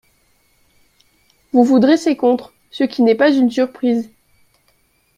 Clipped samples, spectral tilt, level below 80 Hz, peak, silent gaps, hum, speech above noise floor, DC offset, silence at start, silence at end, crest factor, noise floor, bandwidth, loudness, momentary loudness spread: under 0.1%; -5.5 dB/octave; -62 dBFS; 0 dBFS; none; none; 46 dB; under 0.1%; 1.55 s; 1.15 s; 16 dB; -60 dBFS; 10.5 kHz; -15 LUFS; 10 LU